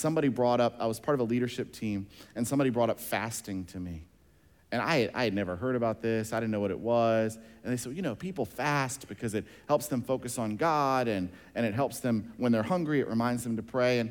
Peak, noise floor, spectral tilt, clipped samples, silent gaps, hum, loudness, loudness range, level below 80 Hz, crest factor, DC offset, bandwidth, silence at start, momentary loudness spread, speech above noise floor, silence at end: -14 dBFS; -62 dBFS; -5.5 dB/octave; under 0.1%; none; none; -30 LUFS; 3 LU; -62 dBFS; 16 dB; under 0.1%; 19 kHz; 0 s; 9 LU; 32 dB; 0 s